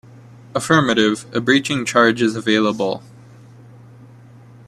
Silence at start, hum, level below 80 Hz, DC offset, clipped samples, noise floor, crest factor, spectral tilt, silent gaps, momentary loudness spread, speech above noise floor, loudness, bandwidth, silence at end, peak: 0.55 s; none; -58 dBFS; under 0.1%; under 0.1%; -43 dBFS; 20 dB; -4.5 dB/octave; none; 10 LU; 26 dB; -17 LUFS; 13.5 kHz; 1.7 s; 0 dBFS